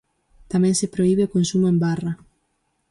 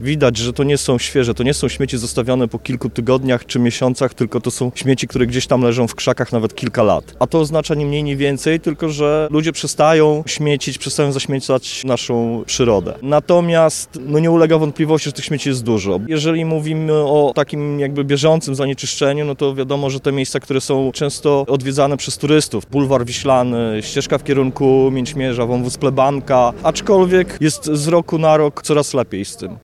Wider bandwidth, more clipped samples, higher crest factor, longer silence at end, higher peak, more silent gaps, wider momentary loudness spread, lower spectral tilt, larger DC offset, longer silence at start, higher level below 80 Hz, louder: second, 11.5 kHz vs 14.5 kHz; neither; about the same, 12 dB vs 14 dB; first, 0.75 s vs 0.05 s; second, -10 dBFS vs -2 dBFS; neither; about the same, 8 LU vs 6 LU; about the same, -6 dB/octave vs -5.5 dB/octave; neither; first, 0.5 s vs 0 s; second, -54 dBFS vs -42 dBFS; second, -21 LUFS vs -16 LUFS